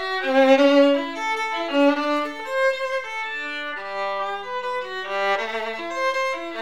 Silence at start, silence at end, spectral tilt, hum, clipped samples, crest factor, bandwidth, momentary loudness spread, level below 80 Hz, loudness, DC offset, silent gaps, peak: 0 s; 0 s; -3 dB/octave; none; under 0.1%; 18 dB; 12.5 kHz; 12 LU; -68 dBFS; -22 LUFS; 0.6%; none; -6 dBFS